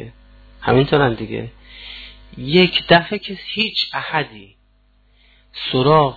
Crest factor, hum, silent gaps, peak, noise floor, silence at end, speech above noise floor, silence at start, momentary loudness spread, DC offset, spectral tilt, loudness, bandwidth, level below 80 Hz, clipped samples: 18 dB; 50 Hz at -45 dBFS; none; 0 dBFS; -56 dBFS; 0 s; 39 dB; 0 s; 22 LU; under 0.1%; -7.5 dB/octave; -17 LUFS; 4.8 kHz; -44 dBFS; under 0.1%